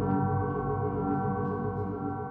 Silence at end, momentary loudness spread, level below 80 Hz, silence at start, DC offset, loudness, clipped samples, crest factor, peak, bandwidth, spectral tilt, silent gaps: 0 s; 5 LU; -48 dBFS; 0 s; under 0.1%; -31 LUFS; under 0.1%; 12 dB; -18 dBFS; 3.1 kHz; -12.5 dB/octave; none